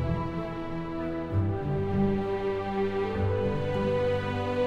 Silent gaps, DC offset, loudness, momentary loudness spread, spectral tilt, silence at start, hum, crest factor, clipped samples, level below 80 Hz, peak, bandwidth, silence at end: none; under 0.1%; -29 LUFS; 6 LU; -8.5 dB/octave; 0 s; none; 12 dB; under 0.1%; -44 dBFS; -16 dBFS; 7.8 kHz; 0 s